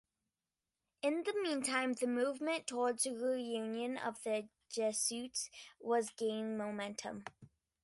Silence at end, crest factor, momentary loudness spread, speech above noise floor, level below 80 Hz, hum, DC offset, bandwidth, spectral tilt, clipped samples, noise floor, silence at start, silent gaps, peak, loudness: 0.35 s; 18 dB; 9 LU; over 52 dB; -82 dBFS; none; under 0.1%; 12 kHz; -2.5 dB/octave; under 0.1%; under -90 dBFS; 1.05 s; none; -20 dBFS; -38 LUFS